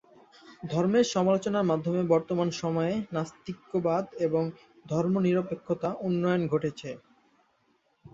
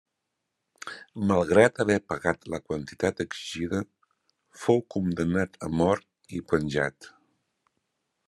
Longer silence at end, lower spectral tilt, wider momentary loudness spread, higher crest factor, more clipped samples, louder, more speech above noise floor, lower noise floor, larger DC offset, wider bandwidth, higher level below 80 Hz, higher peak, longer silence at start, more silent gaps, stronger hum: second, 0.05 s vs 1.2 s; about the same, -6.5 dB/octave vs -6 dB/octave; second, 10 LU vs 17 LU; about the same, 18 dB vs 22 dB; neither; about the same, -28 LUFS vs -27 LUFS; second, 42 dB vs 56 dB; second, -70 dBFS vs -82 dBFS; neither; second, 7.8 kHz vs 12.5 kHz; second, -66 dBFS vs -58 dBFS; second, -10 dBFS vs -6 dBFS; second, 0.45 s vs 0.85 s; neither; neither